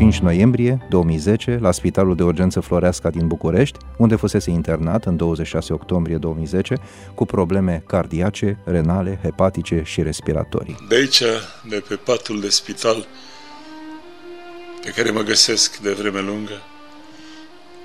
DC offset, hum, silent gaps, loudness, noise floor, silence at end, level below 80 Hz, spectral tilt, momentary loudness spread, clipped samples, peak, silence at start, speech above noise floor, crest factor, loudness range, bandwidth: under 0.1%; none; none; -19 LUFS; -42 dBFS; 0 s; -36 dBFS; -5 dB/octave; 19 LU; under 0.1%; 0 dBFS; 0 s; 23 dB; 18 dB; 3 LU; 14.5 kHz